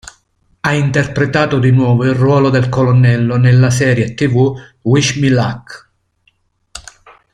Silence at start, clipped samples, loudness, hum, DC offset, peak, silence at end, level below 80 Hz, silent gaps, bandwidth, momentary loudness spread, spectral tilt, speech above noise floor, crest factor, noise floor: 0.65 s; under 0.1%; -12 LUFS; none; under 0.1%; 0 dBFS; 0.55 s; -44 dBFS; none; 11 kHz; 11 LU; -6.5 dB/octave; 47 dB; 14 dB; -59 dBFS